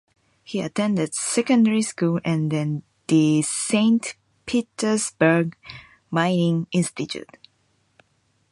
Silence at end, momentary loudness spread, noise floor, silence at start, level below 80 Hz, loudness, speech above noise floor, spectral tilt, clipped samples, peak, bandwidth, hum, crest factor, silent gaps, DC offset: 1.3 s; 13 LU; -66 dBFS; 0.5 s; -64 dBFS; -22 LUFS; 45 dB; -5 dB/octave; under 0.1%; -4 dBFS; 11.5 kHz; none; 18 dB; none; under 0.1%